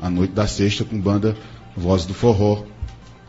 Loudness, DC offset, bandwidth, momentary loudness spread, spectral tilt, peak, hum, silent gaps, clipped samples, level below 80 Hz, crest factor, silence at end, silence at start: -20 LUFS; under 0.1%; 8 kHz; 17 LU; -6.5 dB/octave; -4 dBFS; none; none; under 0.1%; -38 dBFS; 16 dB; 0.15 s; 0 s